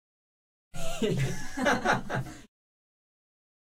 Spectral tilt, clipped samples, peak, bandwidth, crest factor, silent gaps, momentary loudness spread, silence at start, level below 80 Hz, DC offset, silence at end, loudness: -5 dB/octave; under 0.1%; -12 dBFS; 15.5 kHz; 20 dB; none; 18 LU; 0.75 s; -42 dBFS; under 0.1%; 1.35 s; -30 LUFS